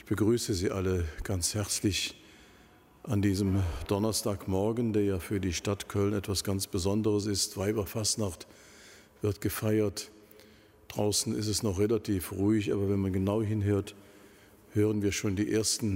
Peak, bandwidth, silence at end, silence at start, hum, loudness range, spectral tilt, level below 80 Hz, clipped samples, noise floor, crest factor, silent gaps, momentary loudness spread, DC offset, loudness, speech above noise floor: -14 dBFS; 16 kHz; 0 s; 0.05 s; none; 2 LU; -5 dB/octave; -50 dBFS; under 0.1%; -58 dBFS; 16 dB; none; 6 LU; under 0.1%; -30 LUFS; 29 dB